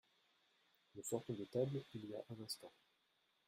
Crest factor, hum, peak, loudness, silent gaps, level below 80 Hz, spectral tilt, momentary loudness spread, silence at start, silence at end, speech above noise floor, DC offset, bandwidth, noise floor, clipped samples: 22 dB; none; -28 dBFS; -47 LUFS; none; -84 dBFS; -5.5 dB/octave; 10 LU; 0.95 s; 0.8 s; 35 dB; under 0.1%; 15.5 kHz; -81 dBFS; under 0.1%